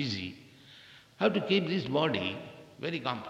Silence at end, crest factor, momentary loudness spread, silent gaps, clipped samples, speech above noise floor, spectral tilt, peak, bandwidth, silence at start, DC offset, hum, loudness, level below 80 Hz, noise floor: 0 s; 20 dB; 23 LU; none; under 0.1%; 25 dB; -6 dB/octave; -12 dBFS; 11 kHz; 0 s; under 0.1%; none; -31 LUFS; -72 dBFS; -55 dBFS